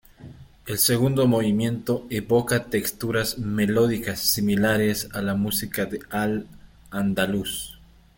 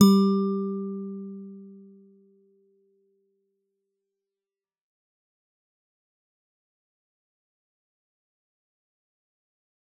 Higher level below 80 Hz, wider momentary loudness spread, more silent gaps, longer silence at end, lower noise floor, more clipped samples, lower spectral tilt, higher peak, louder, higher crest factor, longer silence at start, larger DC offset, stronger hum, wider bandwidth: first, -50 dBFS vs -82 dBFS; second, 8 LU vs 24 LU; neither; second, 0.45 s vs 8.25 s; second, -45 dBFS vs under -90 dBFS; neither; second, -4.5 dB/octave vs -7.5 dB/octave; about the same, -6 dBFS vs -4 dBFS; about the same, -23 LUFS vs -25 LUFS; second, 18 dB vs 26 dB; first, 0.2 s vs 0 s; neither; neither; first, 17 kHz vs 8.8 kHz